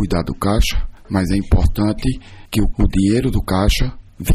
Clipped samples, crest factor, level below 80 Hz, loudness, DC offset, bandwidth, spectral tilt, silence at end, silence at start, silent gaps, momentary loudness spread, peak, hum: under 0.1%; 12 dB; -22 dBFS; -19 LUFS; under 0.1%; 15.5 kHz; -6 dB/octave; 0 s; 0 s; none; 8 LU; -4 dBFS; none